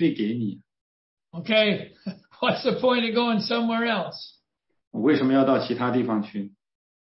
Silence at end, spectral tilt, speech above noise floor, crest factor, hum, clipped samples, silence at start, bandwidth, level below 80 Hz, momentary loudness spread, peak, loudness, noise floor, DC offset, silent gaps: 0.55 s; -9 dB/octave; 52 dB; 16 dB; none; under 0.1%; 0 s; 6 kHz; -70 dBFS; 18 LU; -8 dBFS; -24 LUFS; -75 dBFS; under 0.1%; 0.81-1.17 s, 4.87-4.91 s